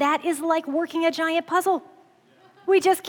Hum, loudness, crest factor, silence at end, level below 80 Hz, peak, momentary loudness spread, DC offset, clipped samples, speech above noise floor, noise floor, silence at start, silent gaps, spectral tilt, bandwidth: none; -23 LUFS; 16 dB; 0 s; -80 dBFS; -8 dBFS; 6 LU; under 0.1%; under 0.1%; 34 dB; -56 dBFS; 0 s; none; -2.5 dB/octave; 19 kHz